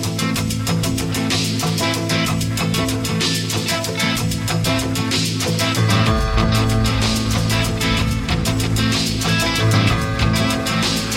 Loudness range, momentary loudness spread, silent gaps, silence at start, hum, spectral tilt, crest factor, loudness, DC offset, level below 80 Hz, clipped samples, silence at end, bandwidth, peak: 1 LU; 4 LU; none; 0 s; none; -4.5 dB/octave; 16 dB; -18 LUFS; under 0.1%; -30 dBFS; under 0.1%; 0 s; 16.5 kHz; -2 dBFS